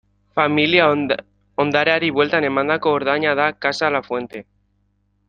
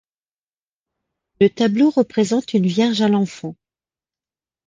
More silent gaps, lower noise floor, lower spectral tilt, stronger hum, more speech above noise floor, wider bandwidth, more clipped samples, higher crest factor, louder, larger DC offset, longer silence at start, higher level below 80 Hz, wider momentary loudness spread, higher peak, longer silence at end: neither; second, -65 dBFS vs under -90 dBFS; about the same, -5.5 dB/octave vs -6 dB/octave; first, 50 Hz at -40 dBFS vs none; second, 46 dB vs over 73 dB; about the same, 9 kHz vs 9.6 kHz; neither; about the same, 18 dB vs 18 dB; about the same, -18 LUFS vs -18 LUFS; neither; second, 0.35 s vs 1.4 s; about the same, -60 dBFS vs -62 dBFS; first, 12 LU vs 8 LU; about the same, -2 dBFS vs -4 dBFS; second, 0.85 s vs 1.15 s